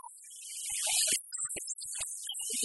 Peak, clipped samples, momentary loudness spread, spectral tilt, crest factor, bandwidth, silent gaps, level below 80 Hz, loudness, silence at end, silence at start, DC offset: -14 dBFS; under 0.1%; 14 LU; 2 dB/octave; 22 dB; 12 kHz; none; -72 dBFS; -32 LUFS; 0 s; 0.05 s; under 0.1%